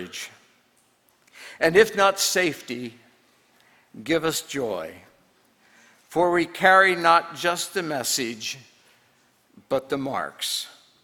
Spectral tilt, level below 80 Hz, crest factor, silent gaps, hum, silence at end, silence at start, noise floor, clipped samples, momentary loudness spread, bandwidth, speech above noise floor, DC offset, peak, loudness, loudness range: -2.5 dB/octave; -64 dBFS; 24 dB; none; none; 0.3 s; 0 s; -63 dBFS; under 0.1%; 21 LU; 19 kHz; 41 dB; under 0.1%; -2 dBFS; -22 LUFS; 8 LU